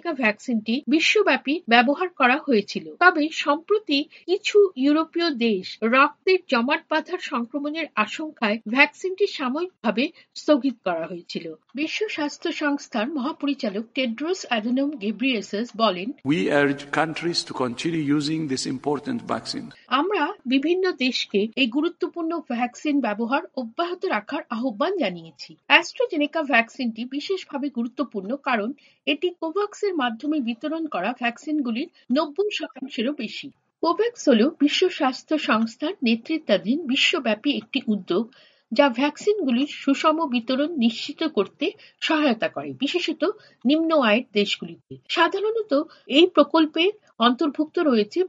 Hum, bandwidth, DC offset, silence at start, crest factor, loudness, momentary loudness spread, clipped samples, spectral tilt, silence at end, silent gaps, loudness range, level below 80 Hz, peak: none; 9.8 kHz; under 0.1%; 0.05 s; 22 dB; -23 LUFS; 10 LU; under 0.1%; -4.5 dB/octave; 0 s; none; 5 LU; -74 dBFS; 0 dBFS